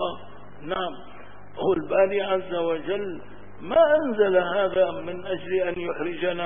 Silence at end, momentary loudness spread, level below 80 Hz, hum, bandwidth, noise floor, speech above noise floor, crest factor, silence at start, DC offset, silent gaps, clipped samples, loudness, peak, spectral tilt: 0 s; 17 LU; -56 dBFS; none; 3.7 kHz; -44 dBFS; 21 dB; 18 dB; 0 s; 1%; none; under 0.1%; -24 LUFS; -8 dBFS; -9.5 dB/octave